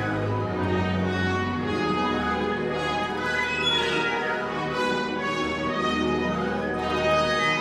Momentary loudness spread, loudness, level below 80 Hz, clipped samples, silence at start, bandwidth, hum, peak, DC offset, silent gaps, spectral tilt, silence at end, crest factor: 5 LU; -25 LUFS; -48 dBFS; under 0.1%; 0 s; 13 kHz; none; -12 dBFS; under 0.1%; none; -5 dB/octave; 0 s; 14 dB